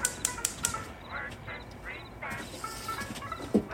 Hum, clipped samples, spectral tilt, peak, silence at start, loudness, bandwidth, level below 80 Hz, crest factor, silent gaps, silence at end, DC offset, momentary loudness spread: none; under 0.1%; -3 dB/octave; -6 dBFS; 0 s; -35 LUFS; 17 kHz; -52 dBFS; 30 dB; none; 0 s; under 0.1%; 11 LU